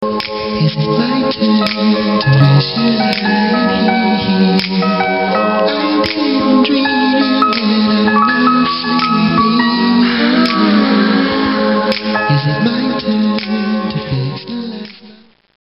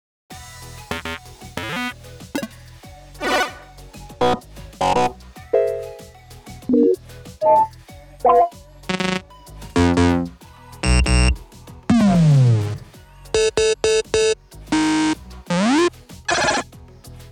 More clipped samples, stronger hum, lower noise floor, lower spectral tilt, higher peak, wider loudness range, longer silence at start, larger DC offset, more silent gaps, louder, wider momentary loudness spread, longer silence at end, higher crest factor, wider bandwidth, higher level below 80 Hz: neither; neither; about the same, -42 dBFS vs -42 dBFS; first, -8 dB/octave vs -5.5 dB/octave; first, 0 dBFS vs -4 dBFS; second, 3 LU vs 8 LU; second, 0 s vs 0.3 s; first, 0.2% vs under 0.1%; neither; first, -13 LUFS vs -19 LUFS; second, 6 LU vs 21 LU; first, 0.5 s vs 0.05 s; about the same, 12 dB vs 16 dB; second, 6 kHz vs 20 kHz; second, -46 dBFS vs -32 dBFS